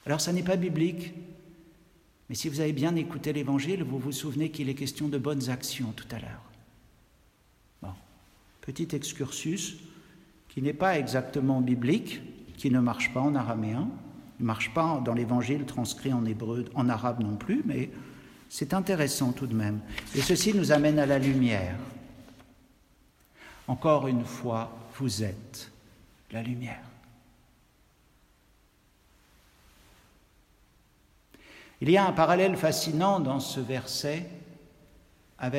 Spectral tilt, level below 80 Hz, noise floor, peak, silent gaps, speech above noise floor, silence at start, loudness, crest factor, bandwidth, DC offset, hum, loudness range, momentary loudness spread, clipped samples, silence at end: -5.5 dB/octave; -60 dBFS; -64 dBFS; -8 dBFS; none; 36 dB; 0.05 s; -29 LUFS; 22 dB; 16 kHz; under 0.1%; none; 11 LU; 18 LU; under 0.1%; 0 s